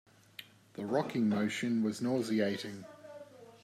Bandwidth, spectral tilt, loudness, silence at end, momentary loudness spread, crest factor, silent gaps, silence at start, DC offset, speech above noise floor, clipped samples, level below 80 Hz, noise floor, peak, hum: 14.5 kHz; -6 dB/octave; -33 LUFS; 0.1 s; 20 LU; 18 dB; none; 0.4 s; under 0.1%; 22 dB; under 0.1%; -80 dBFS; -55 dBFS; -18 dBFS; none